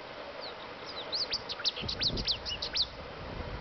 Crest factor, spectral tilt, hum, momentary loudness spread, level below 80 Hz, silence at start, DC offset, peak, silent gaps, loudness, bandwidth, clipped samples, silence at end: 16 dB; -1 dB/octave; none; 12 LU; -50 dBFS; 0 s; under 0.1%; -20 dBFS; none; -33 LUFS; 6.6 kHz; under 0.1%; 0 s